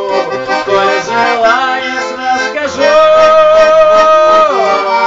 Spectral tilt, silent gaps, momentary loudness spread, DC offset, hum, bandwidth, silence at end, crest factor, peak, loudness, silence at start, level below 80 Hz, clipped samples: -3 dB/octave; none; 9 LU; under 0.1%; none; 7.8 kHz; 0 s; 8 dB; 0 dBFS; -8 LUFS; 0 s; -44 dBFS; under 0.1%